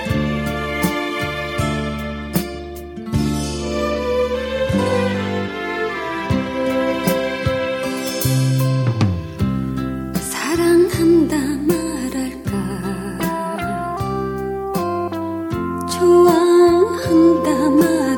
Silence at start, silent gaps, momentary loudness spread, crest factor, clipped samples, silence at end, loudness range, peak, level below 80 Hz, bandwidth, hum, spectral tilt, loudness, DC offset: 0 s; none; 10 LU; 16 dB; under 0.1%; 0 s; 7 LU; -2 dBFS; -36 dBFS; 18 kHz; none; -6 dB/octave; -19 LUFS; under 0.1%